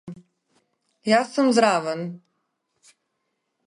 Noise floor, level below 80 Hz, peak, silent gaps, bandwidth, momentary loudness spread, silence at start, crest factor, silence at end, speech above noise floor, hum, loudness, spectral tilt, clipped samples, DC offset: -77 dBFS; -74 dBFS; -4 dBFS; none; 11.5 kHz; 16 LU; 0.05 s; 20 dB; 1.5 s; 56 dB; none; -21 LUFS; -4.5 dB/octave; under 0.1%; under 0.1%